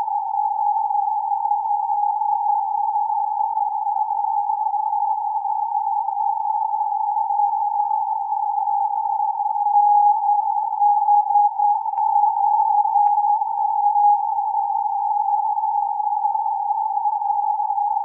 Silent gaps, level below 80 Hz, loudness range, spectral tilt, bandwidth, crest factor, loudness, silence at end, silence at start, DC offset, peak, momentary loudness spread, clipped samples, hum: none; under -90 dBFS; 4 LU; -2 dB/octave; 1.1 kHz; 12 dB; -20 LUFS; 0 s; 0 s; under 0.1%; -8 dBFS; 5 LU; under 0.1%; none